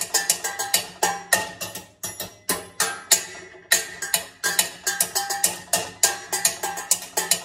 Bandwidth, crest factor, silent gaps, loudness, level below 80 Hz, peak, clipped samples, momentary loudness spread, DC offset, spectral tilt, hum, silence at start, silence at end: 16.5 kHz; 24 dB; none; -22 LUFS; -64 dBFS; 0 dBFS; under 0.1%; 12 LU; under 0.1%; 0.5 dB/octave; none; 0 s; 0 s